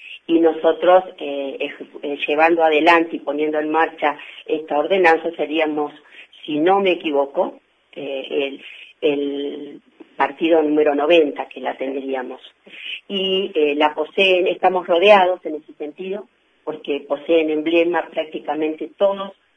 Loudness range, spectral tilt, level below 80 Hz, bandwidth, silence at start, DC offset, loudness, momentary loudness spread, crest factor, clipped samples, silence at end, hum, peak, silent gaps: 5 LU; -5.5 dB/octave; -70 dBFS; 8.4 kHz; 0 s; under 0.1%; -19 LUFS; 16 LU; 20 dB; under 0.1%; 0.25 s; none; 0 dBFS; none